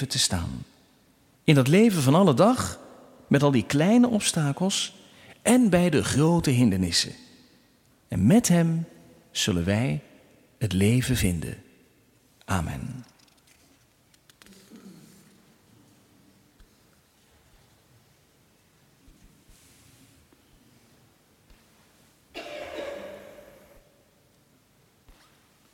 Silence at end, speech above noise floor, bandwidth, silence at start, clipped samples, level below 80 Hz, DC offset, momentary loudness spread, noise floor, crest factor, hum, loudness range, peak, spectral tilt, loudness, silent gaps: 2.55 s; 40 dB; 16.5 kHz; 0 s; under 0.1%; -50 dBFS; under 0.1%; 20 LU; -62 dBFS; 22 dB; none; 20 LU; -4 dBFS; -5 dB/octave; -23 LUFS; none